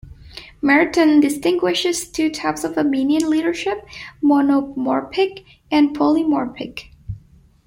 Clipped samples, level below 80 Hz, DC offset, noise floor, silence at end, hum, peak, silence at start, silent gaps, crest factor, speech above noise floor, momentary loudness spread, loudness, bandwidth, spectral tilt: under 0.1%; -50 dBFS; under 0.1%; -48 dBFS; 0.5 s; none; -2 dBFS; 0.05 s; none; 16 dB; 31 dB; 20 LU; -18 LUFS; 16.5 kHz; -4 dB/octave